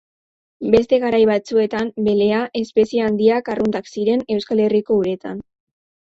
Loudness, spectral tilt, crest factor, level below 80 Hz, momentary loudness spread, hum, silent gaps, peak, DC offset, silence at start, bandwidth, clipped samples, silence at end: -18 LUFS; -6.5 dB/octave; 18 dB; -52 dBFS; 6 LU; none; none; 0 dBFS; under 0.1%; 0.6 s; 7.8 kHz; under 0.1%; 0.6 s